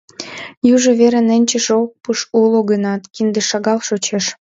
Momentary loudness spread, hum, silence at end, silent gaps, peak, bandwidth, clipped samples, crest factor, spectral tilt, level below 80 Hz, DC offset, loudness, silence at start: 9 LU; none; 0.2 s; 0.57-0.61 s; 0 dBFS; 8 kHz; under 0.1%; 14 dB; -4 dB/octave; -62 dBFS; under 0.1%; -15 LUFS; 0.2 s